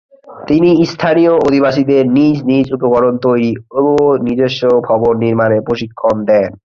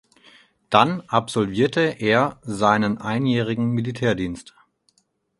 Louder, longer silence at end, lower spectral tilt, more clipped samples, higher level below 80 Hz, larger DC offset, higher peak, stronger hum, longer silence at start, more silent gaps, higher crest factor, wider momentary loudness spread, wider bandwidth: first, -12 LUFS vs -21 LUFS; second, 0.2 s vs 1 s; first, -7.5 dB/octave vs -6 dB/octave; neither; first, -46 dBFS vs -54 dBFS; neither; about the same, -2 dBFS vs 0 dBFS; neither; second, 0.25 s vs 0.7 s; neither; second, 10 dB vs 22 dB; about the same, 5 LU vs 6 LU; second, 7.2 kHz vs 11.5 kHz